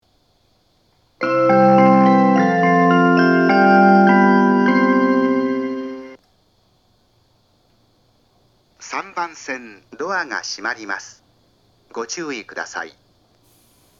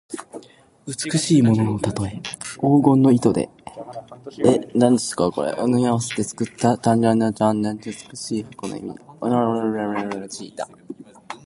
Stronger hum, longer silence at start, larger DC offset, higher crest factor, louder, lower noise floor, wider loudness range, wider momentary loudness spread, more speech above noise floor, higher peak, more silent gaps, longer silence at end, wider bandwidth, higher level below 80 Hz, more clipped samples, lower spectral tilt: neither; first, 1.2 s vs 0.1 s; neither; about the same, 18 dB vs 20 dB; first, -16 LUFS vs -20 LUFS; first, -61 dBFS vs -43 dBFS; first, 19 LU vs 6 LU; second, 17 LU vs 20 LU; first, 33 dB vs 23 dB; about the same, 0 dBFS vs -2 dBFS; neither; first, 1.1 s vs 0.1 s; second, 7.4 kHz vs 11.5 kHz; second, -68 dBFS vs -54 dBFS; neither; about the same, -6.5 dB/octave vs -6 dB/octave